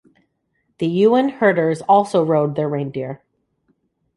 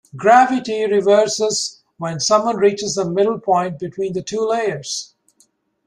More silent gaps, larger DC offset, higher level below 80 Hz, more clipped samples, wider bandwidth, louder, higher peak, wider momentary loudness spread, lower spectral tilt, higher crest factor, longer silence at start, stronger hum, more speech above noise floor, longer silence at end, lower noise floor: neither; neither; about the same, -64 dBFS vs -62 dBFS; neither; about the same, 11.5 kHz vs 11.5 kHz; about the same, -18 LUFS vs -18 LUFS; about the same, -2 dBFS vs -2 dBFS; about the same, 12 LU vs 12 LU; first, -7.5 dB/octave vs -3.5 dB/octave; about the same, 16 dB vs 16 dB; first, 0.8 s vs 0.15 s; neither; first, 52 dB vs 43 dB; first, 1 s vs 0.8 s; first, -69 dBFS vs -60 dBFS